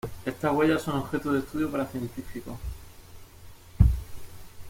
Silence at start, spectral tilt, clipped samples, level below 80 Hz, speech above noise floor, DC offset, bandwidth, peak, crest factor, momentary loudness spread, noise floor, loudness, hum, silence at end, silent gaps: 0.05 s; -7 dB/octave; under 0.1%; -36 dBFS; 19 dB; under 0.1%; 16.5 kHz; -4 dBFS; 24 dB; 19 LU; -47 dBFS; -28 LUFS; none; 0 s; none